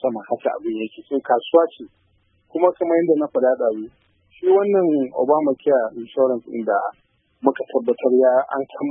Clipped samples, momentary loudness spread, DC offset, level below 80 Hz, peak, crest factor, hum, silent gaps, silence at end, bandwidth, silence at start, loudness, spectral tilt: under 0.1%; 10 LU; under 0.1%; -70 dBFS; 0 dBFS; 18 dB; none; none; 0 s; 3.7 kHz; 0 s; -20 LUFS; -11 dB/octave